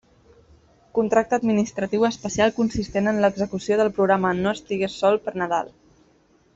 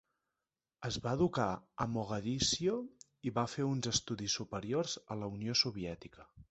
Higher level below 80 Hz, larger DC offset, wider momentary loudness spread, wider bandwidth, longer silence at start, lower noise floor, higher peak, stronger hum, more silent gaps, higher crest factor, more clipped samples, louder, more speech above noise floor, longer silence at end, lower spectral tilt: first, -52 dBFS vs -60 dBFS; neither; second, 6 LU vs 12 LU; about the same, 8 kHz vs 8.2 kHz; first, 0.95 s vs 0.8 s; second, -59 dBFS vs under -90 dBFS; first, -6 dBFS vs -18 dBFS; neither; neither; about the same, 18 dB vs 20 dB; neither; first, -22 LUFS vs -36 LUFS; second, 38 dB vs over 54 dB; first, 0.9 s vs 0.1 s; first, -5.5 dB/octave vs -4 dB/octave